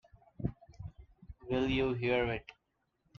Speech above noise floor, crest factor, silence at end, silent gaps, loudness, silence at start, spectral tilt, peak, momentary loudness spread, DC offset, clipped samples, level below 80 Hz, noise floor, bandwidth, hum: 48 dB; 18 dB; 0.65 s; none; -34 LUFS; 0.4 s; -7.5 dB/octave; -18 dBFS; 19 LU; under 0.1%; under 0.1%; -52 dBFS; -81 dBFS; 7 kHz; none